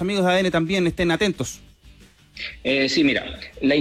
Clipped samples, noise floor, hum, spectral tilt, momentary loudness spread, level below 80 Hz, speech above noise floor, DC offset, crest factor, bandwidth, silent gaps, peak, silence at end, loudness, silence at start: under 0.1%; -49 dBFS; none; -5 dB/octave; 15 LU; -46 dBFS; 28 dB; under 0.1%; 12 dB; 15.5 kHz; none; -10 dBFS; 0 s; -21 LUFS; 0 s